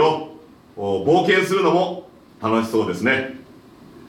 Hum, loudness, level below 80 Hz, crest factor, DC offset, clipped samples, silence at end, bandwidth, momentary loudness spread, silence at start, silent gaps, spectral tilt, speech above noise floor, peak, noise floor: none; -20 LUFS; -64 dBFS; 16 dB; under 0.1%; under 0.1%; 0.1 s; 17 kHz; 16 LU; 0 s; none; -5.5 dB/octave; 26 dB; -4 dBFS; -45 dBFS